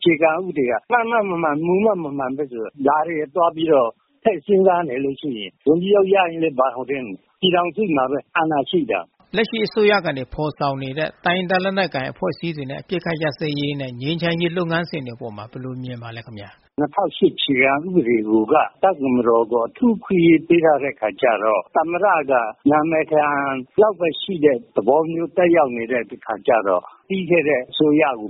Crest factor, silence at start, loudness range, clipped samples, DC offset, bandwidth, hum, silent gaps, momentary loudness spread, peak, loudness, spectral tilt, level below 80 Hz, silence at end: 18 dB; 0 s; 6 LU; under 0.1%; under 0.1%; 5.8 kHz; none; none; 10 LU; -2 dBFS; -19 LUFS; -4 dB/octave; -56 dBFS; 0 s